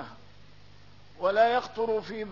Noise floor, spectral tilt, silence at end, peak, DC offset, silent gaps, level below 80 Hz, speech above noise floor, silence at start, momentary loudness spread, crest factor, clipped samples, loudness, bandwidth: -55 dBFS; -5 dB/octave; 0 s; -10 dBFS; 0.3%; none; -62 dBFS; 28 dB; 0 s; 8 LU; 20 dB; under 0.1%; -27 LUFS; 6 kHz